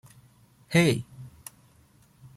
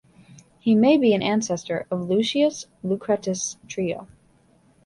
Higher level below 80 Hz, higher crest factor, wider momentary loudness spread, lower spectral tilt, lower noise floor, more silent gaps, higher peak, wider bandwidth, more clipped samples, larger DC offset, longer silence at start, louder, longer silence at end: about the same, -62 dBFS vs -62 dBFS; about the same, 20 dB vs 18 dB; first, 24 LU vs 12 LU; about the same, -5.5 dB/octave vs -5 dB/octave; about the same, -59 dBFS vs -59 dBFS; neither; second, -10 dBFS vs -6 dBFS; first, 15.5 kHz vs 11.5 kHz; neither; neither; about the same, 0.7 s vs 0.65 s; about the same, -25 LUFS vs -23 LUFS; first, 1.1 s vs 0.8 s